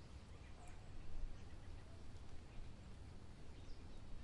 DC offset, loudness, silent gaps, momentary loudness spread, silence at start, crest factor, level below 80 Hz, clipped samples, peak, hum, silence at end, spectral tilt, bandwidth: under 0.1%; -59 LUFS; none; 4 LU; 0 s; 16 dB; -54 dBFS; under 0.1%; -34 dBFS; none; 0 s; -5.5 dB/octave; 11 kHz